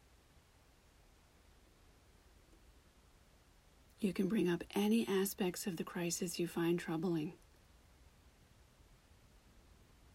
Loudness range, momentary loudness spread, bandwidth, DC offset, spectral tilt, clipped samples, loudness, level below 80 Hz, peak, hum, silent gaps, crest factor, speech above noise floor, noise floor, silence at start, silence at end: 10 LU; 7 LU; 16 kHz; under 0.1%; -5 dB/octave; under 0.1%; -38 LUFS; -68 dBFS; -24 dBFS; none; none; 18 dB; 30 dB; -67 dBFS; 4 s; 0.55 s